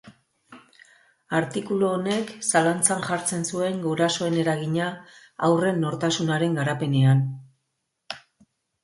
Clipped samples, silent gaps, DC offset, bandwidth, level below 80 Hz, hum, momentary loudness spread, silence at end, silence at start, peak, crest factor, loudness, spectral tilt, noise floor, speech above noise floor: under 0.1%; none; under 0.1%; 12 kHz; -66 dBFS; none; 13 LU; 0.65 s; 0.05 s; -4 dBFS; 22 dB; -24 LUFS; -5 dB/octave; -78 dBFS; 55 dB